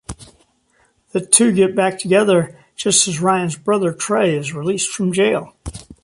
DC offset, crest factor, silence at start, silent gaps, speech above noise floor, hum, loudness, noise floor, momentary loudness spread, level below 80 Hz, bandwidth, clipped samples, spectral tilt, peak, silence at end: under 0.1%; 18 dB; 0.1 s; none; 43 dB; none; -16 LUFS; -60 dBFS; 13 LU; -46 dBFS; 15 kHz; under 0.1%; -3.5 dB/octave; 0 dBFS; 0.1 s